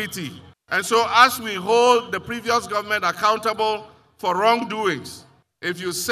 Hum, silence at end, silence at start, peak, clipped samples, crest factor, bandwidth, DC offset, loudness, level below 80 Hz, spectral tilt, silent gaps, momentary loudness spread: none; 0 s; 0 s; 0 dBFS; under 0.1%; 22 dB; 15.5 kHz; under 0.1%; -20 LUFS; -62 dBFS; -2.5 dB/octave; none; 14 LU